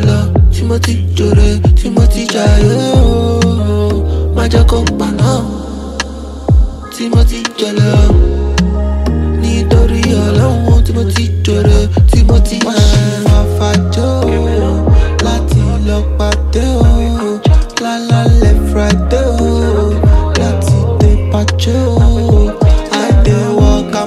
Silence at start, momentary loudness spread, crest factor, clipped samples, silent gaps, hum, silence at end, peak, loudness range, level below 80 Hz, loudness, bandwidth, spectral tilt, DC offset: 0 s; 5 LU; 10 dB; under 0.1%; none; none; 0 s; 0 dBFS; 3 LU; -12 dBFS; -11 LUFS; 13 kHz; -6.5 dB/octave; under 0.1%